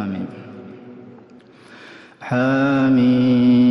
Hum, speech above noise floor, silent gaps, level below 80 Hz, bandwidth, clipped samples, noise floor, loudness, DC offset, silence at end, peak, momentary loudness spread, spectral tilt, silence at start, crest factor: none; 30 dB; none; -58 dBFS; 6 kHz; under 0.1%; -45 dBFS; -17 LUFS; under 0.1%; 0 s; -6 dBFS; 24 LU; -8.5 dB/octave; 0 s; 12 dB